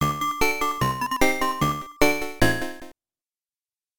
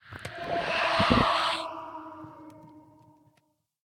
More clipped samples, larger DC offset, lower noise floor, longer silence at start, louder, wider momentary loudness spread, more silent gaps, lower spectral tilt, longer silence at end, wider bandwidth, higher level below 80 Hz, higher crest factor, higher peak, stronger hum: neither; neither; first, under -90 dBFS vs -72 dBFS; about the same, 0 s vs 0.05 s; first, -23 LUFS vs -26 LUFS; second, 5 LU vs 23 LU; neither; about the same, -4 dB/octave vs -5 dB/octave; second, 0 s vs 1.05 s; first, 19.5 kHz vs 16 kHz; first, -40 dBFS vs -50 dBFS; about the same, 20 dB vs 22 dB; about the same, -6 dBFS vs -8 dBFS; neither